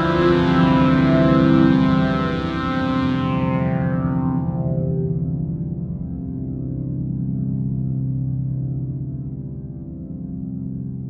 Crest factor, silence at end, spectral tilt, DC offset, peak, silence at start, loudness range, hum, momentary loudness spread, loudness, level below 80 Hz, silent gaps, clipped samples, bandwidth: 16 dB; 0 s; -9 dB/octave; under 0.1%; -4 dBFS; 0 s; 9 LU; none; 14 LU; -20 LUFS; -38 dBFS; none; under 0.1%; 6.6 kHz